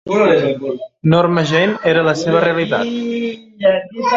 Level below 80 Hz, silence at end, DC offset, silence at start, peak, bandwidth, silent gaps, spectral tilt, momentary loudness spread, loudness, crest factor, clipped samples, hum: -54 dBFS; 0 s; under 0.1%; 0.05 s; 0 dBFS; 7.8 kHz; none; -6.5 dB/octave; 8 LU; -15 LUFS; 14 dB; under 0.1%; none